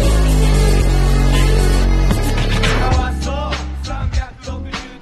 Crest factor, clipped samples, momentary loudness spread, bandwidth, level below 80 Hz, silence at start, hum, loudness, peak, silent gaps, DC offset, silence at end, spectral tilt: 14 dB; under 0.1%; 11 LU; 13 kHz; -16 dBFS; 0 s; none; -17 LUFS; 0 dBFS; none; under 0.1%; 0.05 s; -5.5 dB/octave